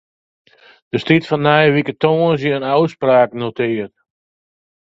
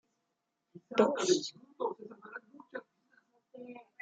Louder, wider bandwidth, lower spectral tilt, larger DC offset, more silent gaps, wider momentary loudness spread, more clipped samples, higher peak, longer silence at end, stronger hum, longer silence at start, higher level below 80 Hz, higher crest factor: first, -16 LUFS vs -32 LUFS; second, 7.8 kHz vs 9.4 kHz; first, -8 dB/octave vs -3.5 dB/octave; neither; neither; second, 10 LU vs 21 LU; neither; first, 0 dBFS vs -12 dBFS; first, 1 s vs 0.2 s; neither; first, 0.95 s vs 0.75 s; first, -58 dBFS vs -86 dBFS; second, 16 dB vs 24 dB